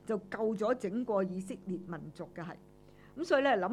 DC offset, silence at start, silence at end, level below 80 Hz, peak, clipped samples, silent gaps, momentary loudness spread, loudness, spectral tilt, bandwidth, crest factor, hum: under 0.1%; 0.05 s; 0 s; -68 dBFS; -14 dBFS; under 0.1%; none; 17 LU; -34 LUFS; -6 dB/octave; 12.5 kHz; 20 dB; 50 Hz at -60 dBFS